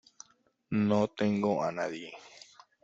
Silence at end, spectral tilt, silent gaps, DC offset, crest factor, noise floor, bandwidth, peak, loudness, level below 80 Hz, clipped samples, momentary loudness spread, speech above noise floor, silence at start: 0.45 s; -6.5 dB/octave; none; under 0.1%; 18 dB; -68 dBFS; 7.8 kHz; -14 dBFS; -30 LUFS; -70 dBFS; under 0.1%; 21 LU; 38 dB; 0.7 s